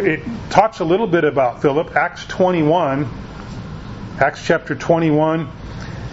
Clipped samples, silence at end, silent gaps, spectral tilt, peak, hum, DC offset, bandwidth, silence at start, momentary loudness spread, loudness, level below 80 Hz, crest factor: under 0.1%; 0 s; none; -6.5 dB/octave; 0 dBFS; none; under 0.1%; 8 kHz; 0 s; 16 LU; -17 LUFS; -40 dBFS; 18 dB